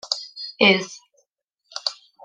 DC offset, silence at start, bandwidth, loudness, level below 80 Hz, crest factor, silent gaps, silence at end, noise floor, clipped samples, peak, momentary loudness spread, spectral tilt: under 0.1%; 0.05 s; 9.6 kHz; -20 LUFS; -72 dBFS; 24 dB; 1.44-1.48 s; 0.3 s; -73 dBFS; under 0.1%; -2 dBFS; 19 LU; -3.5 dB/octave